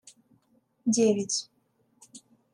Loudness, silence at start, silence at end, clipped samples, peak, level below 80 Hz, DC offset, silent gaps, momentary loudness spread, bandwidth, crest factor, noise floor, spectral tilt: -27 LUFS; 0.85 s; 0.35 s; under 0.1%; -12 dBFS; -80 dBFS; under 0.1%; none; 11 LU; 11.5 kHz; 18 dB; -70 dBFS; -4 dB/octave